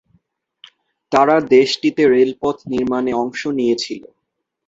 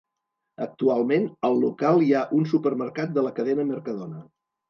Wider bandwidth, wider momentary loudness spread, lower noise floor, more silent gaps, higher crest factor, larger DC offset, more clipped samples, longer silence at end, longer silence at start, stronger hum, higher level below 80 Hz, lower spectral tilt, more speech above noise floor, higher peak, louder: first, 7.8 kHz vs 6.6 kHz; second, 9 LU vs 14 LU; second, -75 dBFS vs -82 dBFS; neither; about the same, 16 dB vs 16 dB; neither; neither; first, 0.7 s vs 0.45 s; first, 1.1 s vs 0.6 s; neither; first, -56 dBFS vs -76 dBFS; second, -5 dB/octave vs -8.5 dB/octave; about the same, 59 dB vs 58 dB; first, -2 dBFS vs -8 dBFS; first, -16 LUFS vs -24 LUFS